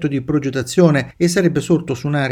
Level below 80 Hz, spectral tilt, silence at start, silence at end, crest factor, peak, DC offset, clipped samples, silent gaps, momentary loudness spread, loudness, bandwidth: -48 dBFS; -6 dB/octave; 0 s; 0 s; 16 dB; 0 dBFS; under 0.1%; under 0.1%; none; 5 LU; -17 LUFS; 15.5 kHz